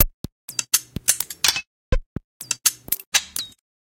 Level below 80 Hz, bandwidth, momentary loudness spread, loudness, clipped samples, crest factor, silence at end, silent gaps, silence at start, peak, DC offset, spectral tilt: -32 dBFS; 17 kHz; 14 LU; -22 LUFS; under 0.1%; 24 dB; 0.35 s; 0.14-0.24 s, 0.32-0.48 s, 1.67-1.92 s, 2.06-2.16 s, 2.24-2.40 s, 3.07-3.12 s; 0 s; 0 dBFS; under 0.1%; -0.5 dB/octave